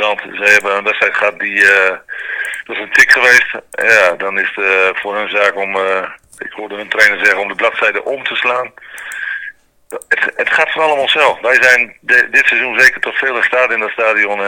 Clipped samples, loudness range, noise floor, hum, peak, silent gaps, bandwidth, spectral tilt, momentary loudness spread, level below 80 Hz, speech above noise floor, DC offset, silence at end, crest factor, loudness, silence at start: 0.7%; 5 LU; -33 dBFS; none; 0 dBFS; none; over 20 kHz; -1.5 dB/octave; 15 LU; -56 dBFS; 20 dB; under 0.1%; 0 s; 14 dB; -11 LUFS; 0 s